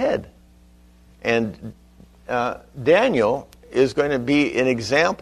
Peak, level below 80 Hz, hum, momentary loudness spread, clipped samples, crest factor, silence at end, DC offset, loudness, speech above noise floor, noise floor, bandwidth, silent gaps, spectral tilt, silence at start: -4 dBFS; -50 dBFS; 60 Hz at -50 dBFS; 11 LU; under 0.1%; 18 dB; 0.05 s; under 0.1%; -21 LUFS; 31 dB; -51 dBFS; 13 kHz; none; -5.5 dB/octave; 0 s